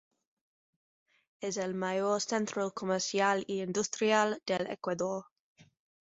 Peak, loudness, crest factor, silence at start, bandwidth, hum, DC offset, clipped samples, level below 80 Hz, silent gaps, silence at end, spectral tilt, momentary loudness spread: -14 dBFS; -32 LUFS; 20 dB; 1.4 s; 8 kHz; none; under 0.1%; under 0.1%; -76 dBFS; none; 0.8 s; -3.5 dB/octave; 7 LU